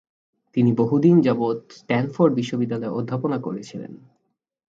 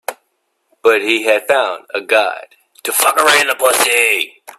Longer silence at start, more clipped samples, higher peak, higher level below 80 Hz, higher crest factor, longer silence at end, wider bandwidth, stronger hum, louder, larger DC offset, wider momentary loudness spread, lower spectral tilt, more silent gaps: first, 0.55 s vs 0.1 s; neither; second, -4 dBFS vs 0 dBFS; about the same, -64 dBFS vs -68 dBFS; about the same, 18 dB vs 16 dB; first, 0.75 s vs 0.3 s; second, 7.8 kHz vs 16 kHz; neither; second, -21 LUFS vs -13 LUFS; neither; first, 16 LU vs 11 LU; first, -8.5 dB/octave vs 0 dB/octave; neither